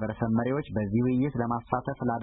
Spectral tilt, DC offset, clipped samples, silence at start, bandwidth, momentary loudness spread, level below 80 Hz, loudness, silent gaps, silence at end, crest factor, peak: -12.5 dB/octave; under 0.1%; under 0.1%; 0 s; 4 kHz; 5 LU; -52 dBFS; -28 LUFS; none; 0 s; 18 dB; -10 dBFS